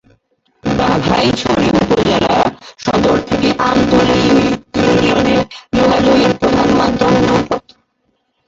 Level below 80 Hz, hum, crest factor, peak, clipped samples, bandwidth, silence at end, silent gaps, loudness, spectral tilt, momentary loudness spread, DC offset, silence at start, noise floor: -36 dBFS; none; 12 dB; 0 dBFS; under 0.1%; 8 kHz; 0.9 s; none; -13 LUFS; -5.5 dB/octave; 6 LU; under 0.1%; 0.65 s; -64 dBFS